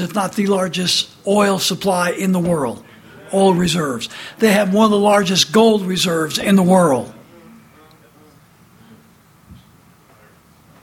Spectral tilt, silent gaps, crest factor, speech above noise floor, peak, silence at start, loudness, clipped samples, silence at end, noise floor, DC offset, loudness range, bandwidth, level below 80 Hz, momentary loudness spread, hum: -4.5 dB/octave; none; 18 dB; 34 dB; 0 dBFS; 0 s; -16 LUFS; under 0.1%; 1.3 s; -49 dBFS; under 0.1%; 5 LU; 16.5 kHz; -52 dBFS; 9 LU; none